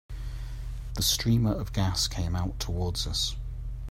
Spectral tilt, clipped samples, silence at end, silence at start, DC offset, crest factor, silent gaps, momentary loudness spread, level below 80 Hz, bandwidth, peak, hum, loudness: -4 dB/octave; under 0.1%; 0 s; 0.1 s; under 0.1%; 16 dB; none; 14 LU; -36 dBFS; 16 kHz; -14 dBFS; none; -29 LUFS